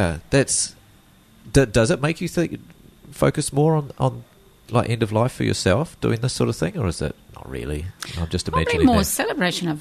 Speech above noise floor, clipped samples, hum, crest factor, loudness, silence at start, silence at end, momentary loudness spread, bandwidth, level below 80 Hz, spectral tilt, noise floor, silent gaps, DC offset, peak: 31 dB; under 0.1%; none; 18 dB; -21 LUFS; 0 s; 0 s; 12 LU; 13.5 kHz; -38 dBFS; -5 dB/octave; -52 dBFS; none; under 0.1%; -2 dBFS